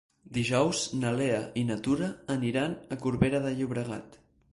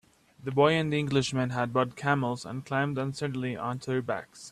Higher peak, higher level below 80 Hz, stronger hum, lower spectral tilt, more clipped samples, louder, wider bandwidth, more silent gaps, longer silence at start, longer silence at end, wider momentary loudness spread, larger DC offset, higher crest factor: about the same, -10 dBFS vs -10 dBFS; first, -56 dBFS vs -64 dBFS; neither; about the same, -5.5 dB/octave vs -6 dB/octave; neither; about the same, -30 LUFS vs -29 LUFS; about the same, 11.5 kHz vs 12.5 kHz; neither; about the same, 0.3 s vs 0.4 s; first, 0.4 s vs 0 s; second, 7 LU vs 10 LU; neither; about the same, 20 dB vs 20 dB